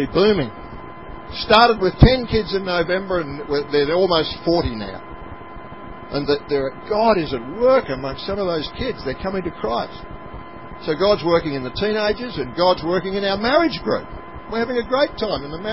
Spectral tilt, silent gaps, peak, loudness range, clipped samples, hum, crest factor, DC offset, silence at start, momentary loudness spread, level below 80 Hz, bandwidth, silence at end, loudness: -8 dB/octave; none; 0 dBFS; 5 LU; under 0.1%; none; 20 dB; 0.8%; 0 s; 20 LU; -34 dBFS; 8 kHz; 0 s; -20 LUFS